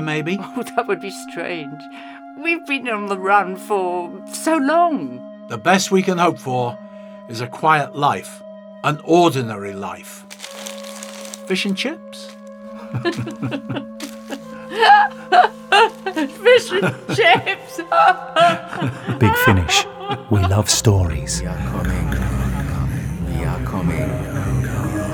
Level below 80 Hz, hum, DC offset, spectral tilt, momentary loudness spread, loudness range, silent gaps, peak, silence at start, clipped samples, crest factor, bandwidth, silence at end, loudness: -36 dBFS; none; under 0.1%; -4.5 dB/octave; 18 LU; 10 LU; none; 0 dBFS; 0 s; under 0.1%; 18 dB; 20 kHz; 0 s; -18 LUFS